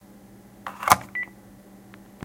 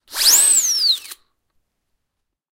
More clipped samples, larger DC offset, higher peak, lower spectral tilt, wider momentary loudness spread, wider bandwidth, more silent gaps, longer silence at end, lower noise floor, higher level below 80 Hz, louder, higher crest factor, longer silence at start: neither; neither; about the same, 0 dBFS vs -2 dBFS; first, -2.5 dB/octave vs 4.5 dB/octave; first, 19 LU vs 7 LU; about the same, 17 kHz vs 16.5 kHz; neither; second, 1 s vs 1.4 s; second, -49 dBFS vs -77 dBFS; about the same, -58 dBFS vs -60 dBFS; second, -24 LUFS vs -13 LUFS; first, 30 dB vs 18 dB; first, 0.65 s vs 0.1 s